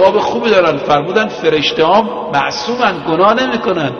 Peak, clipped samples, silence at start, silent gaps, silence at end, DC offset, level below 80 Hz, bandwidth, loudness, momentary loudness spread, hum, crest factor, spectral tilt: 0 dBFS; under 0.1%; 0 s; none; 0 s; under 0.1%; -48 dBFS; 6.8 kHz; -13 LUFS; 4 LU; none; 12 dB; -5 dB/octave